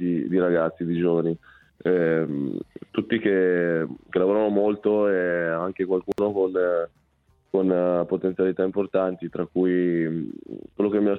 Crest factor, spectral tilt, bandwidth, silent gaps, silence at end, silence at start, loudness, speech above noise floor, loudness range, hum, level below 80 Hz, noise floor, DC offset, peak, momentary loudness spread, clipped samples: 14 dB; -9.5 dB/octave; 4.5 kHz; none; 0 s; 0 s; -24 LUFS; 41 dB; 2 LU; none; -62 dBFS; -64 dBFS; under 0.1%; -8 dBFS; 9 LU; under 0.1%